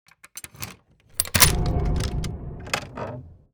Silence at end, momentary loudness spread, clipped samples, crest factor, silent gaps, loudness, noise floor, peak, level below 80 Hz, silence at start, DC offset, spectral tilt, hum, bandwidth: 0.2 s; 23 LU; under 0.1%; 24 dB; none; -22 LUFS; -50 dBFS; -2 dBFS; -32 dBFS; 0.25 s; under 0.1%; -3 dB/octave; none; over 20 kHz